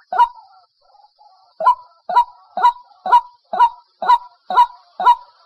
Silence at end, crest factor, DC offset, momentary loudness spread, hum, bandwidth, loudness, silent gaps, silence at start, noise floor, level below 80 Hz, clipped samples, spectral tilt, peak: 0.25 s; 16 dB; under 0.1%; 8 LU; none; 11.5 kHz; -17 LUFS; none; 0.1 s; -53 dBFS; -58 dBFS; under 0.1%; -2 dB/octave; -2 dBFS